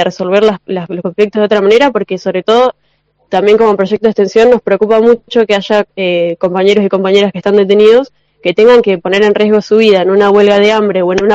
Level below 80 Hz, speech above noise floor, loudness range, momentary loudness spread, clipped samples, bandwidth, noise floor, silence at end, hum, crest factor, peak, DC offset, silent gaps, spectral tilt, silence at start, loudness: -48 dBFS; 44 dB; 3 LU; 8 LU; 1%; 7.8 kHz; -53 dBFS; 0 s; none; 8 dB; 0 dBFS; 0.2%; none; -6 dB/octave; 0 s; -9 LUFS